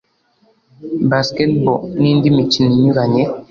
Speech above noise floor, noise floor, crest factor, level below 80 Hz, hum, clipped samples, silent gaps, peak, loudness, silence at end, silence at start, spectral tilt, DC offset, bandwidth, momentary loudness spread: 43 dB; -57 dBFS; 14 dB; -48 dBFS; none; under 0.1%; none; -2 dBFS; -14 LUFS; 0.05 s; 0.8 s; -7 dB/octave; under 0.1%; 7.4 kHz; 6 LU